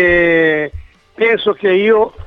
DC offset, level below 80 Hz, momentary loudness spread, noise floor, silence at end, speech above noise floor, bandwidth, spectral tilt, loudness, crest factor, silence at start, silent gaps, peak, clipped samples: under 0.1%; -38 dBFS; 7 LU; -33 dBFS; 0 s; 21 dB; 5.8 kHz; -7.5 dB/octave; -13 LUFS; 12 dB; 0 s; none; 0 dBFS; under 0.1%